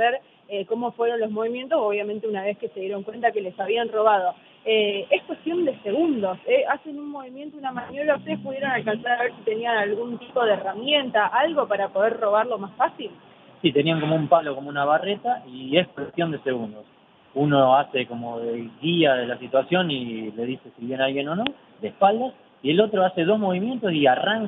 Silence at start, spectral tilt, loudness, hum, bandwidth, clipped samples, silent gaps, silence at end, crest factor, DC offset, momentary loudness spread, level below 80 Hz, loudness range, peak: 0 s; -9 dB/octave; -23 LUFS; none; 4 kHz; under 0.1%; none; 0 s; 20 dB; under 0.1%; 11 LU; -70 dBFS; 3 LU; -4 dBFS